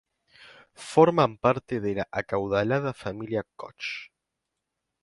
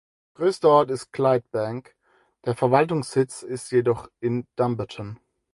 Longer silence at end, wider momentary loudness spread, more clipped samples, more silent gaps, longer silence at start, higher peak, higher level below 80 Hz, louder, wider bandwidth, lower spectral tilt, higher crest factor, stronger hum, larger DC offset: first, 1 s vs 0.4 s; about the same, 15 LU vs 14 LU; neither; neither; first, 0.8 s vs 0.4 s; about the same, -4 dBFS vs -4 dBFS; about the same, -58 dBFS vs -60 dBFS; second, -26 LUFS vs -23 LUFS; about the same, 11.5 kHz vs 11.5 kHz; about the same, -6.5 dB/octave vs -6.5 dB/octave; about the same, 24 dB vs 20 dB; neither; neither